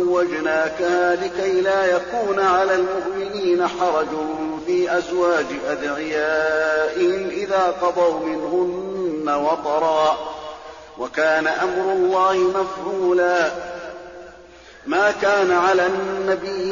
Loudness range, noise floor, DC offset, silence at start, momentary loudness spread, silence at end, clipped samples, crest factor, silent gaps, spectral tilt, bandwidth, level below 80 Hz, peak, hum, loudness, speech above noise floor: 2 LU; -44 dBFS; under 0.1%; 0 s; 9 LU; 0 s; under 0.1%; 12 dB; none; -2.5 dB/octave; 7.2 kHz; -54 dBFS; -8 dBFS; none; -20 LUFS; 24 dB